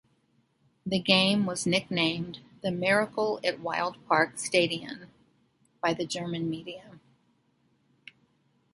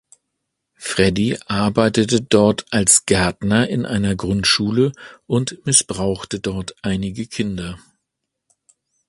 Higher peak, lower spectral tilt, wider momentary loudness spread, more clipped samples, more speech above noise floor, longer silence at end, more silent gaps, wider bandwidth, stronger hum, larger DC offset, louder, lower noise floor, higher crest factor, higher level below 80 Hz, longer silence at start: second, -6 dBFS vs 0 dBFS; about the same, -4 dB/octave vs -4 dB/octave; first, 16 LU vs 11 LU; neither; second, 42 dB vs 60 dB; first, 1.75 s vs 1.3 s; neither; about the same, 11.5 kHz vs 12 kHz; neither; neither; second, -28 LUFS vs -18 LUFS; second, -70 dBFS vs -78 dBFS; about the same, 24 dB vs 20 dB; second, -66 dBFS vs -42 dBFS; about the same, 0.85 s vs 0.8 s